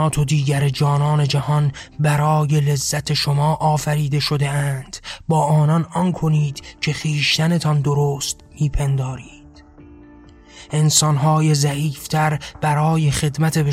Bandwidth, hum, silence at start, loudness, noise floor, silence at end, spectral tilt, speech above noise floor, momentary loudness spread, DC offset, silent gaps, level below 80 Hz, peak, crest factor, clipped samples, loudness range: 15 kHz; none; 0 s; -19 LUFS; -44 dBFS; 0 s; -5 dB/octave; 26 dB; 8 LU; under 0.1%; none; -40 dBFS; -4 dBFS; 16 dB; under 0.1%; 3 LU